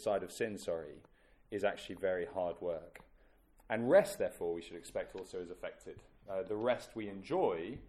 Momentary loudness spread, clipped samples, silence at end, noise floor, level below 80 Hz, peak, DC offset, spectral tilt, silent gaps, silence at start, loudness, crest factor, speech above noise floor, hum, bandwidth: 16 LU; under 0.1%; 0 s; -66 dBFS; -66 dBFS; -16 dBFS; under 0.1%; -5 dB/octave; none; 0 s; -37 LUFS; 22 dB; 29 dB; none; 14.5 kHz